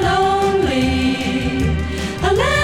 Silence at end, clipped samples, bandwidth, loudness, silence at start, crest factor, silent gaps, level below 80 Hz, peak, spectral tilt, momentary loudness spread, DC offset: 0 s; under 0.1%; 16 kHz; -18 LUFS; 0 s; 14 dB; none; -28 dBFS; -2 dBFS; -5.5 dB/octave; 5 LU; under 0.1%